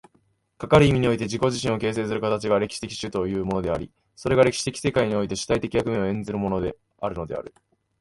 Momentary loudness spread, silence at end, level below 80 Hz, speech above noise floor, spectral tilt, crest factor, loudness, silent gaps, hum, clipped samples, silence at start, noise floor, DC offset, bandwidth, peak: 12 LU; 0.55 s; -46 dBFS; 42 dB; -5.5 dB/octave; 20 dB; -24 LUFS; none; none; under 0.1%; 0.6 s; -66 dBFS; under 0.1%; 11.5 kHz; -4 dBFS